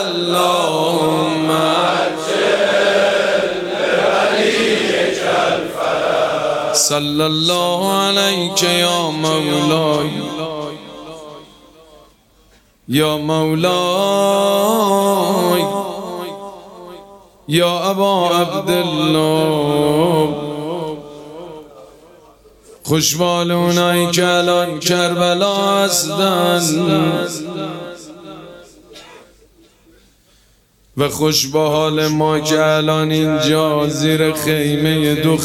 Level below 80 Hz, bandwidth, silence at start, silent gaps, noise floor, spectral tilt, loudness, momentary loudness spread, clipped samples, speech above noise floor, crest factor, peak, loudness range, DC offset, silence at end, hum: -52 dBFS; 16.5 kHz; 0 s; none; -54 dBFS; -4 dB/octave; -15 LUFS; 13 LU; under 0.1%; 39 dB; 14 dB; -2 dBFS; 7 LU; under 0.1%; 0 s; none